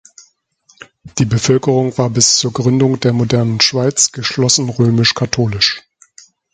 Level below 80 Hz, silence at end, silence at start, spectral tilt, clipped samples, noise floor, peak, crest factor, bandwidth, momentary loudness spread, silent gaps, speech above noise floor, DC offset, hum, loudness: -46 dBFS; 0.75 s; 1.05 s; -4 dB/octave; under 0.1%; -54 dBFS; 0 dBFS; 14 dB; 9.6 kHz; 5 LU; none; 41 dB; under 0.1%; none; -13 LUFS